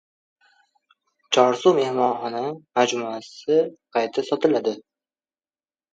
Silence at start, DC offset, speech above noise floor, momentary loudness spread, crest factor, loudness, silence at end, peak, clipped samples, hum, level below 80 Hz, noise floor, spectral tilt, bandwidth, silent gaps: 1.3 s; under 0.1%; over 69 dB; 10 LU; 22 dB; -22 LUFS; 1.15 s; -2 dBFS; under 0.1%; none; -76 dBFS; under -90 dBFS; -4 dB/octave; 8 kHz; none